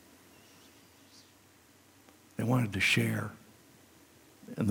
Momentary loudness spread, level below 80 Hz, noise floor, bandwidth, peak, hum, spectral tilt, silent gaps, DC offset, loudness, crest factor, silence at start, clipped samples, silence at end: 24 LU; -72 dBFS; -61 dBFS; 17 kHz; -14 dBFS; none; -5 dB/octave; none; under 0.1%; -30 LUFS; 20 dB; 2.4 s; under 0.1%; 0 s